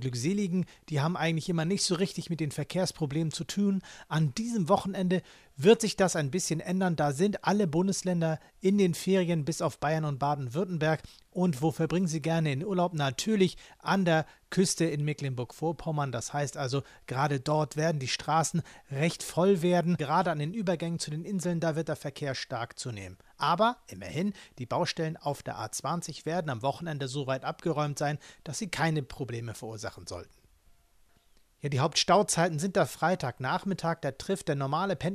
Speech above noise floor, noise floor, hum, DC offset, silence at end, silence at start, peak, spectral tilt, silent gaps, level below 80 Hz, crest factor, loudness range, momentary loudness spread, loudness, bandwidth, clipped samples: 34 dB; -63 dBFS; none; under 0.1%; 0 s; 0 s; -10 dBFS; -5 dB/octave; none; -60 dBFS; 20 dB; 5 LU; 9 LU; -30 LUFS; 15 kHz; under 0.1%